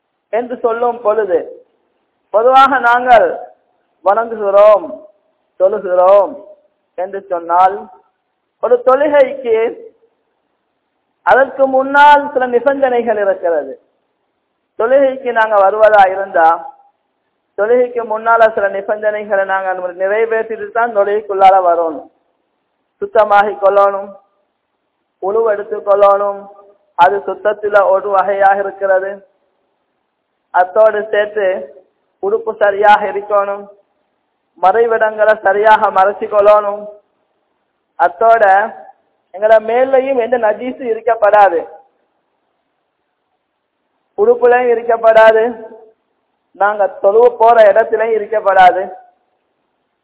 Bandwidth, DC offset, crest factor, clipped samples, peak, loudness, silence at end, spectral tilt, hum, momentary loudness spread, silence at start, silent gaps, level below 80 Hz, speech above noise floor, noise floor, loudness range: 4 kHz; under 0.1%; 14 dB; 0.6%; 0 dBFS; -12 LUFS; 1.05 s; -7.5 dB/octave; none; 12 LU; 0.35 s; none; -56 dBFS; 57 dB; -68 dBFS; 4 LU